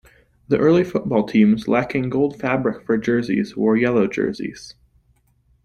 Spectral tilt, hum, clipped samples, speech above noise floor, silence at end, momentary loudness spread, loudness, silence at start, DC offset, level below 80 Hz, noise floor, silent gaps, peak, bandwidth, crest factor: -7.5 dB/octave; none; under 0.1%; 42 dB; 0.95 s; 7 LU; -19 LUFS; 0.5 s; under 0.1%; -52 dBFS; -61 dBFS; none; -2 dBFS; 10 kHz; 16 dB